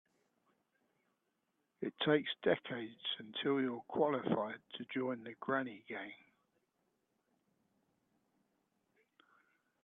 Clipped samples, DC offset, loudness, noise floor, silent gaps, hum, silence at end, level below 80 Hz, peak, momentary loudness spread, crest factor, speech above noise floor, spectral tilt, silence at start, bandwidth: under 0.1%; under 0.1%; -38 LUFS; -84 dBFS; none; none; 3.7 s; -84 dBFS; -16 dBFS; 12 LU; 24 dB; 46 dB; -8 dB/octave; 1.8 s; 4.3 kHz